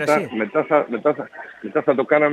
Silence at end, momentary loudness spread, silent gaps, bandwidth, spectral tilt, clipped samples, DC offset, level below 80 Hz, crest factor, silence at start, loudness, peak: 0 s; 12 LU; none; 13 kHz; -6 dB/octave; under 0.1%; under 0.1%; -70 dBFS; 18 dB; 0 s; -20 LUFS; -2 dBFS